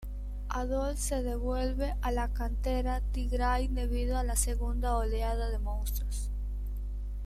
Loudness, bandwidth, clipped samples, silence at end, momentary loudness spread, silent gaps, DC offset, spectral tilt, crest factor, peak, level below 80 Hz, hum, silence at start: -33 LUFS; 14.5 kHz; under 0.1%; 0 s; 8 LU; none; under 0.1%; -5 dB/octave; 16 dB; -14 dBFS; -32 dBFS; 50 Hz at -30 dBFS; 0 s